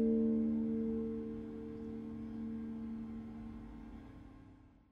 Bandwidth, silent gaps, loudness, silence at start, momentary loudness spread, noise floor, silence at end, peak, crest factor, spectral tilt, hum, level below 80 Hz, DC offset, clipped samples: 3.7 kHz; none; -40 LUFS; 0 s; 21 LU; -60 dBFS; 0.2 s; -24 dBFS; 16 dB; -10.5 dB/octave; none; -58 dBFS; under 0.1%; under 0.1%